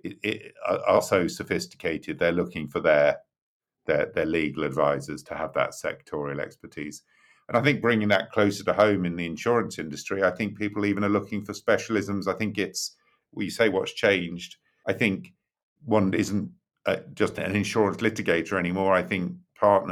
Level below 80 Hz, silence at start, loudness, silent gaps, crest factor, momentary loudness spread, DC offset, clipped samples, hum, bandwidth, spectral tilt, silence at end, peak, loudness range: -60 dBFS; 0.05 s; -26 LUFS; 3.42-3.60 s, 15.63-15.76 s; 20 dB; 12 LU; under 0.1%; under 0.1%; none; 15 kHz; -5.5 dB/octave; 0 s; -6 dBFS; 3 LU